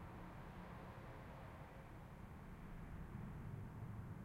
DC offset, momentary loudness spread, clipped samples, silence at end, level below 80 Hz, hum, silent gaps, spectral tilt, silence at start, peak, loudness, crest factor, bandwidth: under 0.1%; 5 LU; under 0.1%; 0 s; -60 dBFS; none; none; -7.5 dB/octave; 0 s; -40 dBFS; -55 LUFS; 14 dB; 16 kHz